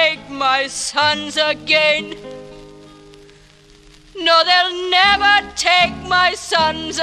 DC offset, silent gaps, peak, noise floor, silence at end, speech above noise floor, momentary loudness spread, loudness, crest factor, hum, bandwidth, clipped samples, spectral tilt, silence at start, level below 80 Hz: under 0.1%; none; 0 dBFS; -47 dBFS; 0 s; 30 dB; 9 LU; -15 LUFS; 16 dB; none; 14.5 kHz; under 0.1%; -1.5 dB/octave; 0 s; -48 dBFS